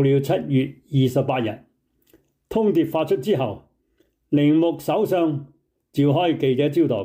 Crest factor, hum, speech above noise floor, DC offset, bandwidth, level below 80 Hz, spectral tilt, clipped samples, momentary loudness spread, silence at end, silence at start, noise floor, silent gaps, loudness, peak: 12 dB; none; 46 dB; under 0.1%; 16 kHz; -60 dBFS; -8 dB/octave; under 0.1%; 9 LU; 0 s; 0 s; -66 dBFS; none; -21 LUFS; -8 dBFS